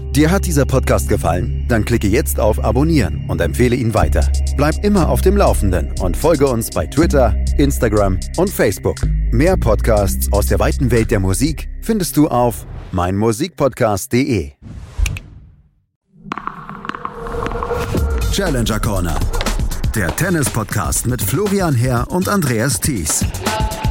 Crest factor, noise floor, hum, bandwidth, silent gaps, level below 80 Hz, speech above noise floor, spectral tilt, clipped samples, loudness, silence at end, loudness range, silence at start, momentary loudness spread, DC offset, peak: 14 dB; -49 dBFS; none; 17 kHz; 15.96-16.01 s; -22 dBFS; 34 dB; -5.5 dB/octave; under 0.1%; -17 LUFS; 0 s; 6 LU; 0 s; 8 LU; under 0.1%; -2 dBFS